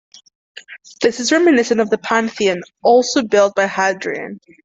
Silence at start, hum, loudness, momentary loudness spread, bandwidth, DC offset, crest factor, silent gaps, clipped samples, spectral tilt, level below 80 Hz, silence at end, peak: 0.55 s; none; -16 LUFS; 12 LU; 8.2 kHz; under 0.1%; 14 dB; none; under 0.1%; -3.5 dB/octave; -60 dBFS; 0.25 s; -2 dBFS